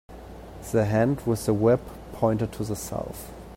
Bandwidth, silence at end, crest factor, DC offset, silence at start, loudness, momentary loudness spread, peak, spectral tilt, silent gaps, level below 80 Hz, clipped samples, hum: 16.5 kHz; 0 s; 18 dB; under 0.1%; 0.1 s; -25 LUFS; 19 LU; -8 dBFS; -7 dB/octave; none; -46 dBFS; under 0.1%; none